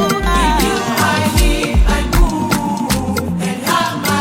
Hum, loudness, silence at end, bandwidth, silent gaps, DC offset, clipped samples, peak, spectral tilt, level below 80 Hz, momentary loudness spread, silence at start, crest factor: none; -15 LUFS; 0 s; 17 kHz; none; under 0.1%; under 0.1%; 0 dBFS; -4.5 dB/octave; -18 dBFS; 4 LU; 0 s; 14 dB